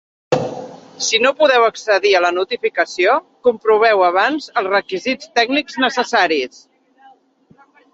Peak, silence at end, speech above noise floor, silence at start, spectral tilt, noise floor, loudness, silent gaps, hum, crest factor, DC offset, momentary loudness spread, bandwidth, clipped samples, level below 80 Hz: 0 dBFS; 1.45 s; 36 dB; 0.3 s; -2.5 dB/octave; -52 dBFS; -16 LUFS; none; none; 16 dB; under 0.1%; 9 LU; 8 kHz; under 0.1%; -64 dBFS